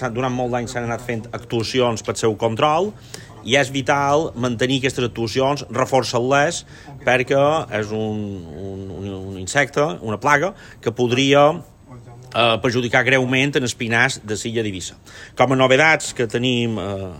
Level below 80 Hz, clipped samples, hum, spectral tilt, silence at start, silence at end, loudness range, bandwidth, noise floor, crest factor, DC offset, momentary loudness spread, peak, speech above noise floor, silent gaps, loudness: -50 dBFS; under 0.1%; none; -4.5 dB/octave; 0 s; 0 s; 4 LU; 16.5 kHz; -40 dBFS; 20 dB; under 0.1%; 14 LU; 0 dBFS; 21 dB; none; -19 LUFS